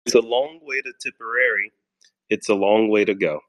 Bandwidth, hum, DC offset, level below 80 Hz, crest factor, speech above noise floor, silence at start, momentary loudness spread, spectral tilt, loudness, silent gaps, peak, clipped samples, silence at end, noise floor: 12.5 kHz; none; under 0.1%; -68 dBFS; 20 dB; 41 dB; 0.05 s; 11 LU; -3.5 dB/octave; -21 LUFS; none; -2 dBFS; under 0.1%; 0.1 s; -62 dBFS